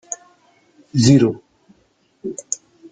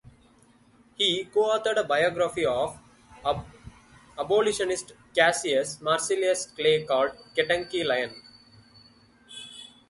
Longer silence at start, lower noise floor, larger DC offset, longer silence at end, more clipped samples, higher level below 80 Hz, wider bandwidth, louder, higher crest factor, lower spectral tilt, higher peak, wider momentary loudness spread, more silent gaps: second, 0.1 s vs 1 s; about the same, -61 dBFS vs -59 dBFS; neither; about the same, 0.35 s vs 0.25 s; neither; first, -54 dBFS vs -60 dBFS; second, 9.4 kHz vs 11.5 kHz; first, -17 LUFS vs -26 LUFS; about the same, 20 dB vs 22 dB; first, -5.5 dB/octave vs -2.5 dB/octave; first, -2 dBFS vs -6 dBFS; first, 19 LU vs 16 LU; neither